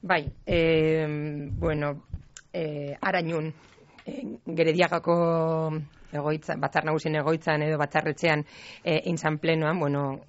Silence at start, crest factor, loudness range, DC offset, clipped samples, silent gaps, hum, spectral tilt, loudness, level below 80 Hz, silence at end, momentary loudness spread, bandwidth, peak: 0.05 s; 20 dB; 4 LU; under 0.1%; under 0.1%; none; none; -5 dB/octave; -27 LUFS; -48 dBFS; 0.05 s; 14 LU; 8 kHz; -8 dBFS